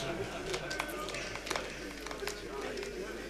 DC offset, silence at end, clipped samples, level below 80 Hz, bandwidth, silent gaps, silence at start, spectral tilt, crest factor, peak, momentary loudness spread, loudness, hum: under 0.1%; 0 s; under 0.1%; -54 dBFS; 15.5 kHz; none; 0 s; -3 dB/octave; 24 dB; -16 dBFS; 4 LU; -39 LUFS; none